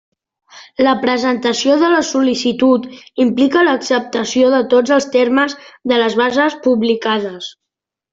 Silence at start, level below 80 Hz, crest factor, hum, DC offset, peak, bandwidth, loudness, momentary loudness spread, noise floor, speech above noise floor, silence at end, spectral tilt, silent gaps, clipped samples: 0.55 s; -58 dBFS; 14 dB; none; under 0.1%; -2 dBFS; 7.8 kHz; -14 LUFS; 7 LU; -81 dBFS; 67 dB; 0.65 s; -3.5 dB/octave; none; under 0.1%